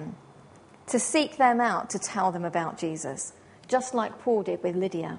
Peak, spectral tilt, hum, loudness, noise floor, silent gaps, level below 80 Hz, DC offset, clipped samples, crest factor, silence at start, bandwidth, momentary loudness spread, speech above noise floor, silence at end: -8 dBFS; -4 dB/octave; none; -27 LUFS; -52 dBFS; none; -70 dBFS; under 0.1%; under 0.1%; 20 dB; 0 s; 10.5 kHz; 13 LU; 26 dB; 0 s